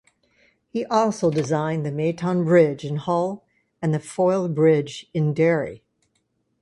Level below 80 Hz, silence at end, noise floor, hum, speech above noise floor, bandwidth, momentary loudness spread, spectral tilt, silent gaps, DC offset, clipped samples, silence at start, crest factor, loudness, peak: -62 dBFS; 0.85 s; -71 dBFS; none; 50 dB; 11.5 kHz; 11 LU; -7 dB/octave; none; under 0.1%; under 0.1%; 0.75 s; 18 dB; -22 LUFS; -4 dBFS